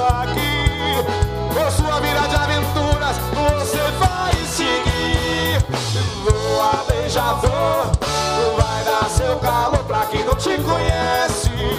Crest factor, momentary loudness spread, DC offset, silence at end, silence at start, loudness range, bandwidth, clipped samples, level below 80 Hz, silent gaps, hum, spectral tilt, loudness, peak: 16 dB; 2 LU; under 0.1%; 0 s; 0 s; 0 LU; 16 kHz; under 0.1%; -26 dBFS; none; none; -4.5 dB/octave; -19 LUFS; -2 dBFS